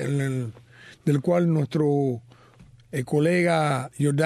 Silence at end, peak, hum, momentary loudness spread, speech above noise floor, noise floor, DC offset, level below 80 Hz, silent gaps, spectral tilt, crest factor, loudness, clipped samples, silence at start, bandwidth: 0 s; -10 dBFS; none; 11 LU; 29 dB; -52 dBFS; under 0.1%; -64 dBFS; none; -7 dB/octave; 14 dB; -24 LUFS; under 0.1%; 0 s; 13.5 kHz